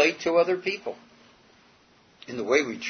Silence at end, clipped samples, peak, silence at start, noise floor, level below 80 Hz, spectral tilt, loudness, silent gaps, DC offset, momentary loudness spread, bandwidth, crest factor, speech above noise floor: 0 s; under 0.1%; -8 dBFS; 0 s; -59 dBFS; -72 dBFS; -3.5 dB/octave; -25 LUFS; none; under 0.1%; 19 LU; 6.6 kHz; 20 dB; 33 dB